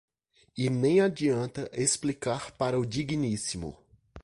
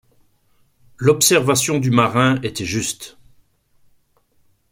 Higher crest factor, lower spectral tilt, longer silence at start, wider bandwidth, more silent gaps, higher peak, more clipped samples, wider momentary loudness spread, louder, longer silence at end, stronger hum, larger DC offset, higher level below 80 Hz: about the same, 18 dB vs 18 dB; about the same, -5 dB/octave vs -4 dB/octave; second, 0.55 s vs 1 s; second, 11.5 kHz vs 16.5 kHz; neither; second, -12 dBFS vs -2 dBFS; neither; about the same, 10 LU vs 11 LU; second, -29 LUFS vs -17 LUFS; second, 0.05 s vs 1.65 s; neither; neither; about the same, -56 dBFS vs -54 dBFS